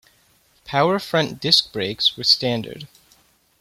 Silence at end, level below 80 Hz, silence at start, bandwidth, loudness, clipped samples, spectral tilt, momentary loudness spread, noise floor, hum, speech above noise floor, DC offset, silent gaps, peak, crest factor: 0.75 s; -60 dBFS; 0.65 s; 16.5 kHz; -19 LUFS; under 0.1%; -4 dB/octave; 11 LU; -59 dBFS; none; 39 dB; under 0.1%; none; -2 dBFS; 22 dB